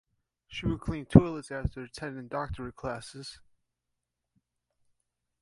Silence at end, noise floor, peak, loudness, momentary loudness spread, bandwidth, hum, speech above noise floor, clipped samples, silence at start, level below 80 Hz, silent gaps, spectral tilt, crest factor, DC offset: 2.05 s; -85 dBFS; 0 dBFS; -30 LUFS; 20 LU; 11.5 kHz; 60 Hz at -60 dBFS; 56 dB; under 0.1%; 0.5 s; -46 dBFS; none; -7.5 dB/octave; 32 dB; under 0.1%